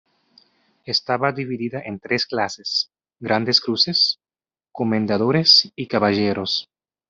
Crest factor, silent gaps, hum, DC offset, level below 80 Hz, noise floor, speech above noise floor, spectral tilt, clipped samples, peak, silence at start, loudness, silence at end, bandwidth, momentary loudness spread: 20 dB; none; none; under 0.1%; -64 dBFS; under -90 dBFS; over 70 dB; -4.5 dB/octave; under 0.1%; -2 dBFS; 0.85 s; -19 LUFS; 0.5 s; 7.8 kHz; 13 LU